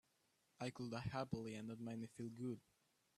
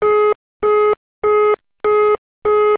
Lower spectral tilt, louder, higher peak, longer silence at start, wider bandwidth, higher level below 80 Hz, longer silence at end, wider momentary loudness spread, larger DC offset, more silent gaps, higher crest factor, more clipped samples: second, -6.5 dB/octave vs -8 dB/octave; second, -49 LUFS vs -16 LUFS; second, -30 dBFS vs -6 dBFS; first, 0.6 s vs 0 s; first, 13.5 kHz vs 4 kHz; second, -74 dBFS vs -52 dBFS; first, 0.6 s vs 0 s; about the same, 5 LU vs 5 LU; neither; second, none vs 0.35-0.60 s, 0.97-1.22 s, 2.18-2.42 s; first, 20 dB vs 8 dB; neither